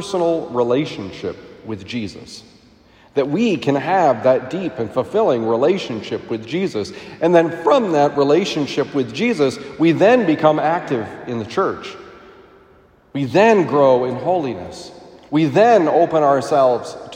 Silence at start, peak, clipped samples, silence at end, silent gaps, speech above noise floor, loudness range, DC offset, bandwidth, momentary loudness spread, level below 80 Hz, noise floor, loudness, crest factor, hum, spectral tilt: 0 s; 0 dBFS; under 0.1%; 0 s; none; 34 dB; 5 LU; under 0.1%; 10.5 kHz; 16 LU; -58 dBFS; -51 dBFS; -17 LUFS; 16 dB; none; -6 dB/octave